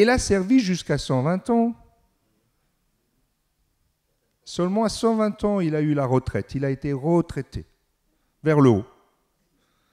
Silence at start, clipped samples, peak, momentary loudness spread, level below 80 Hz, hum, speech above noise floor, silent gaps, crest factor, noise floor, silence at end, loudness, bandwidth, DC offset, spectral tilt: 0 s; under 0.1%; -6 dBFS; 12 LU; -46 dBFS; none; 50 dB; none; 18 dB; -71 dBFS; 1.1 s; -22 LUFS; 13 kHz; under 0.1%; -6.5 dB/octave